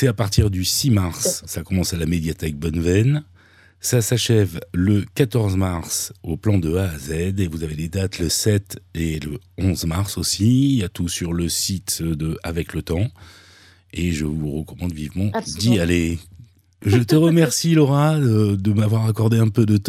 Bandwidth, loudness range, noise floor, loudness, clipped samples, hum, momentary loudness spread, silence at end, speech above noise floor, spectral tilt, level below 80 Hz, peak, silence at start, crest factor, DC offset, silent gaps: 16 kHz; 7 LU; -50 dBFS; -20 LUFS; under 0.1%; none; 10 LU; 0 s; 30 dB; -5.5 dB/octave; -38 dBFS; -4 dBFS; 0 s; 16 dB; under 0.1%; none